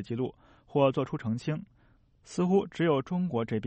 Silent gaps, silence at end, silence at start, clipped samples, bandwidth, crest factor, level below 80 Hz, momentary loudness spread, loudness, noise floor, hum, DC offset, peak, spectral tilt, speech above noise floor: none; 0 s; 0 s; under 0.1%; 8.4 kHz; 18 dB; -64 dBFS; 9 LU; -30 LUFS; -63 dBFS; none; under 0.1%; -12 dBFS; -7.5 dB/octave; 34 dB